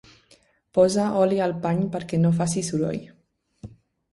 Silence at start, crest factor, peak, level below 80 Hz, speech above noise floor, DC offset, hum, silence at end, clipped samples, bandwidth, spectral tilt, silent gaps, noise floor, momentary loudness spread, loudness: 0.75 s; 18 dB; -6 dBFS; -58 dBFS; 37 dB; under 0.1%; none; 0.45 s; under 0.1%; 11.5 kHz; -6.5 dB/octave; none; -59 dBFS; 7 LU; -23 LUFS